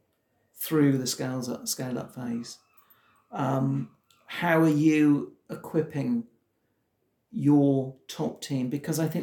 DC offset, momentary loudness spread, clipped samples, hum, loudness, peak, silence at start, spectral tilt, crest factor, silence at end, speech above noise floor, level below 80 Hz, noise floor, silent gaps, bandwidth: under 0.1%; 15 LU; under 0.1%; none; -27 LUFS; -8 dBFS; 0.55 s; -6 dB/octave; 18 dB; 0 s; 49 dB; -74 dBFS; -75 dBFS; none; 17 kHz